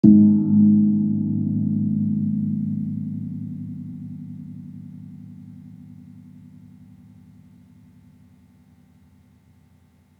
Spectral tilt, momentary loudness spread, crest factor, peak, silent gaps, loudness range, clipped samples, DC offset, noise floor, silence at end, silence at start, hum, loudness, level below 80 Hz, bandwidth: -13 dB/octave; 26 LU; 22 dB; -2 dBFS; none; 25 LU; under 0.1%; under 0.1%; -56 dBFS; 4 s; 0.05 s; none; -20 LUFS; -68 dBFS; 1 kHz